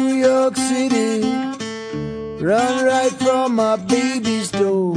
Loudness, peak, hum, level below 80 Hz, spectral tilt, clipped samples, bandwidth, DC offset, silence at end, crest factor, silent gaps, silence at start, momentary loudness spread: -18 LUFS; -4 dBFS; none; -52 dBFS; -4.5 dB/octave; under 0.1%; 10.5 kHz; under 0.1%; 0 s; 14 dB; none; 0 s; 11 LU